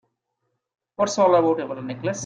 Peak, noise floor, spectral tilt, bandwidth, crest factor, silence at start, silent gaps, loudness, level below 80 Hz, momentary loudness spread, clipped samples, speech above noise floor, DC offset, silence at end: -6 dBFS; -77 dBFS; -5 dB/octave; 9.4 kHz; 18 dB; 1 s; none; -21 LUFS; -68 dBFS; 11 LU; under 0.1%; 56 dB; under 0.1%; 0 s